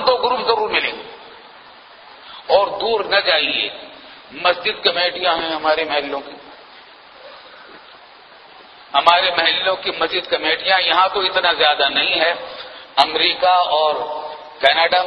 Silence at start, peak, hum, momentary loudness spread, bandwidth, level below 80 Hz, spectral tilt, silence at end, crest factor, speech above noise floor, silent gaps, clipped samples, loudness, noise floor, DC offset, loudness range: 0 s; 0 dBFS; none; 15 LU; 11 kHz; -58 dBFS; -3 dB/octave; 0 s; 18 dB; 26 dB; none; under 0.1%; -16 LUFS; -43 dBFS; under 0.1%; 7 LU